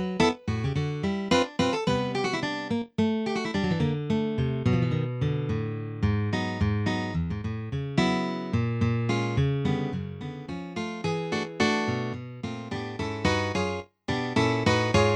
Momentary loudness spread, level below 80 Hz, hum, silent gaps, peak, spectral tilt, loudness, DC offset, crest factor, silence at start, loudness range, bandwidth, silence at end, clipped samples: 9 LU; -46 dBFS; none; none; -8 dBFS; -6 dB/octave; -28 LUFS; under 0.1%; 20 dB; 0 s; 2 LU; 10.5 kHz; 0 s; under 0.1%